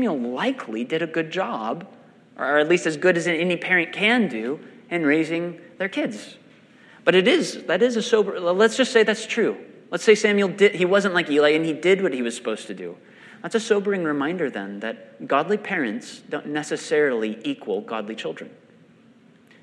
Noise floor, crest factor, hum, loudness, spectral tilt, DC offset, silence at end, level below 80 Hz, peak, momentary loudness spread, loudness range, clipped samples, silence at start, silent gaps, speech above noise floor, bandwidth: -53 dBFS; 20 dB; none; -22 LUFS; -4.5 dB/octave; under 0.1%; 1.15 s; -78 dBFS; -2 dBFS; 14 LU; 6 LU; under 0.1%; 0 s; none; 31 dB; 11 kHz